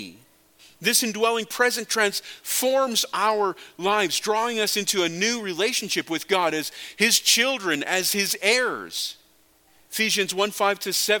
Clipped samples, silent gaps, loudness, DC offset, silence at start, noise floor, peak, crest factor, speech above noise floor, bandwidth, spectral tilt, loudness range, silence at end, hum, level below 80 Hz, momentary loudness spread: under 0.1%; none; -22 LUFS; under 0.1%; 0 s; -59 dBFS; -4 dBFS; 20 dB; 36 dB; 17.5 kHz; -1 dB/octave; 2 LU; 0 s; none; -72 dBFS; 9 LU